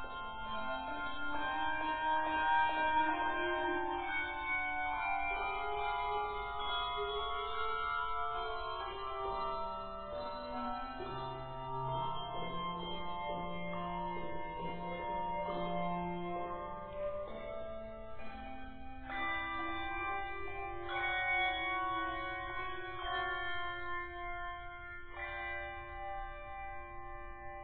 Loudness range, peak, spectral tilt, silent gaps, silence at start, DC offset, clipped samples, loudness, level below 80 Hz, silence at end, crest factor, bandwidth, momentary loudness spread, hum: 8 LU; -22 dBFS; -2 dB/octave; none; 0 s; under 0.1%; under 0.1%; -38 LUFS; -54 dBFS; 0 s; 18 dB; 4.6 kHz; 11 LU; none